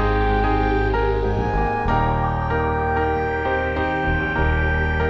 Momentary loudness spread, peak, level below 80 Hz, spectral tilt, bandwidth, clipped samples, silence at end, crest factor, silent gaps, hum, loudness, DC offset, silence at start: 2 LU; -6 dBFS; -26 dBFS; -8.5 dB/octave; 6.8 kHz; under 0.1%; 0 s; 12 dB; none; none; -21 LUFS; under 0.1%; 0 s